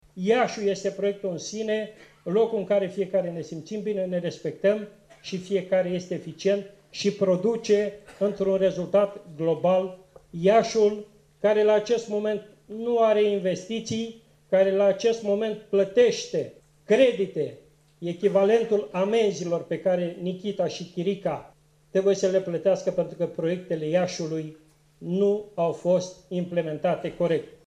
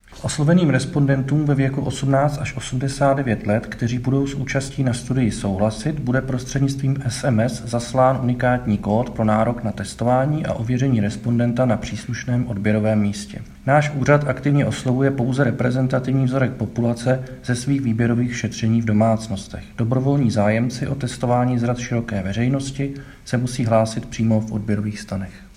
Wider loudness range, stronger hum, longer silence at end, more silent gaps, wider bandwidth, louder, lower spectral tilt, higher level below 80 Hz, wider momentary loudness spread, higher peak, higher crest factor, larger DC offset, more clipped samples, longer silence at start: about the same, 4 LU vs 2 LU; neither; about the same, 0.15 s vs 0.05 s; neither; second, 10 kHz vs 11.5 kHz; second, -25 LUFS vs -20 LUFS; second, -5.5 dB/octave vs -7 dB/octave; second, -66 dBFS vs -42 dBFS; first, 11 LU vs 7 LU; second, -6 dBFS vs 0 dBFS; about the same, 18 dB vs 20 dB; neither; neither; about the same, 0.15 s vs 0.1 s